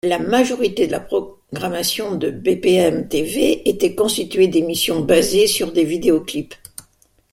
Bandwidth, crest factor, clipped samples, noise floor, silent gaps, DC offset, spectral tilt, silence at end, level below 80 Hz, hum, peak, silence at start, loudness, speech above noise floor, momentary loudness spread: 16.5 kHz; 16 dB; under 0.1%; -57 dBFS; none; under 0.1%; -4 dB/octave; 0.75 s; -48 dBFS; none; -2 dBFS; 0.05 s; -18 LUFS; 39 dB; 11 LU